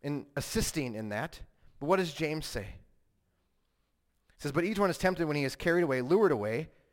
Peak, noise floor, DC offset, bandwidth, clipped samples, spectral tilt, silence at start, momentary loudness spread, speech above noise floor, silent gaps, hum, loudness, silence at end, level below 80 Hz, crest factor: -14 dBFS; -76 dBFS; under 0.1%; 17 kHz; under 0.1%; -5 dB/octave; 0.05 s; 12 LU; 45 dB; none; none; -31 LUFS; 0.25 s; -52 dBFS; 18 dB